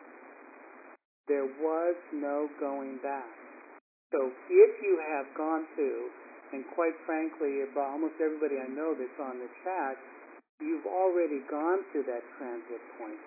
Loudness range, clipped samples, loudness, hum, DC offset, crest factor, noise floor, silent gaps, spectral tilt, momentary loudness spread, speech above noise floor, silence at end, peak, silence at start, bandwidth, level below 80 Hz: 6 LU; under 0.1%; -32 LUFS; none; under 0.1%; 22 dB; -53 dBFS; 1.05-1.24 s, 3.81-4.10 s, 10.49-10.58 s; -7 dB/octave; 21 LU; 21 dB; 0 s; -10 dBFS; 0 s; 2.7 kHz; under -90 dBFS